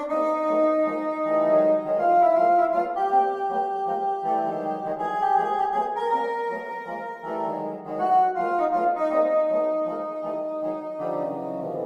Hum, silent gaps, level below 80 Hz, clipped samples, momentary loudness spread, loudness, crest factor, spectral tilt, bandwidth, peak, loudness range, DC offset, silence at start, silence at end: none; none; -68 dBFS; under 0.1%; 10 LU; -24 LUFS; 14 dB; -7 dB/octave; 7.8 kHz; -10 dBFS; 4 LU; under 0.1%; 0 s; 0 s